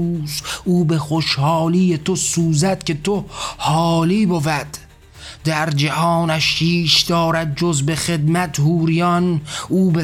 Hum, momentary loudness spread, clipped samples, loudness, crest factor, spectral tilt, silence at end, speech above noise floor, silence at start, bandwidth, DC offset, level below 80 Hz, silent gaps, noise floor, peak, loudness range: none; 7 LU; under 0.1%; -17 LUFS; 14 dB; -5 dB/octave; 0 s; 22 dB; 0 s; 15.5 kHz; under 0.1%; -44 dBFS; none; -39 dBFS; -4 dBFS; 3 LU